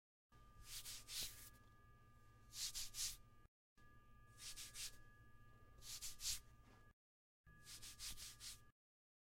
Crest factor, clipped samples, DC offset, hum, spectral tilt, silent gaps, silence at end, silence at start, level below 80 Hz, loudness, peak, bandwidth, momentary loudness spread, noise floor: 24 dB; under 0.1%; under 0.1%; none; 0.5 dB/octave; 3.48-3.76 s, 6.93-7.44 s; 0.55 s; 0.3 s; -68 dBFS; -51 LUFS; -32 dBFS; 16.5 kHz; 22 LU; under -90 dBFS